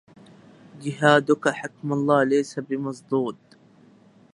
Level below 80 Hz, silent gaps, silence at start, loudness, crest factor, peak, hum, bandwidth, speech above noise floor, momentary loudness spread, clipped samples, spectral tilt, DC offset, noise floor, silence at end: -74 dBFS; none; 0.75 s; -23 LUFS; 22 dB; -2 dBFS; none; 11.5 kHz; 31 dB; 13 LU; under 0.1%; -5.5 dB/octave; under 0.1%; -54 dBFS; 1 s